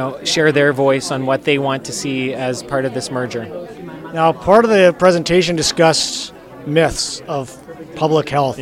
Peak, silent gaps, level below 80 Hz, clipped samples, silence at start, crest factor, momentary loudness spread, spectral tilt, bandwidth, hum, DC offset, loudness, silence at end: 0 dBFS; none; -44 dBFS; under 0.1%; 0 s; 16 dB; 17 LU; -4 dB/octave; 16 kHz; none; under 0.1%; -16 LUFS; 0 s